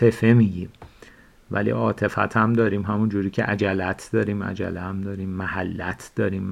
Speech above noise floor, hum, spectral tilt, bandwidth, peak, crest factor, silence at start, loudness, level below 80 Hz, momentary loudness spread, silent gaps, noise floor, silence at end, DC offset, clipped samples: 27 dB; none; -8 dB/octave; 12.5 kHz; -4 dBFS; 18 dB; 0 s; -23 LUFS; -52 dBFS; 11 LU; none; -49 dBFS; 0 s; under 0.1%; under 0.1%